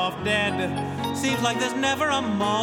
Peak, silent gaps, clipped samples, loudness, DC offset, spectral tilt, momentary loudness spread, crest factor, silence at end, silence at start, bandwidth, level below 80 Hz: -8 dBFS; none; under 0.1%; -24 LUFS; under 0.1%; -4 dB/octave; 5 LU; 16 dB; 0 s; 0 s; 18.5 kHz; -58 dBFS